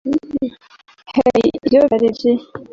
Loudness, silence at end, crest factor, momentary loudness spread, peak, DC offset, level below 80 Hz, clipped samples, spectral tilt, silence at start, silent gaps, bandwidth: -16 LUFS; 0.1 s; 14 dB; 11 LU; -2 dBFS; under 0.1%; -50 dBFS; under 0.1%; -7 dB/octave; 0.05 s; none; 7.6 kHz